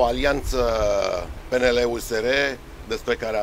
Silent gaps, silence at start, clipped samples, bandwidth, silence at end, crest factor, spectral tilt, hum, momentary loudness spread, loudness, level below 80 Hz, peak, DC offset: none; 0 s; under 0.1%; 16 kHz; 0 s; 16 dB; -4 dB/octave; none; 9 LU; -23 LUFS; -34 dBFS; -6 dBFS; under 0.1%